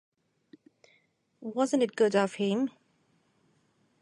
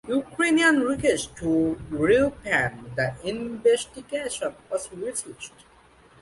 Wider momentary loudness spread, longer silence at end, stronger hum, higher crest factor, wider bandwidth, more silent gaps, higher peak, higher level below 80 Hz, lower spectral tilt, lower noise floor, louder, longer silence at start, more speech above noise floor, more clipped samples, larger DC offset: about the same, 11 LU vs 12 LU; first, 1.3 s vs 0.75 s; neither; about the same, 20 dB vs 18 dB; about the same, 11.5 kHz vs 11.5 kHz; neither; second, -12 dBFS vs -8 dBFS; second, -86 dBFS vs -52 dBFS; about the same, -5.5 dB/octave vs -4.5 dB/octave; first, -70 dBFS vs -55 dBFS; second, -28 LUFS vs -24 LUFS; first, 1.4 s vs 0.05 s; first, 43 dB vs 30 dB; neither; neither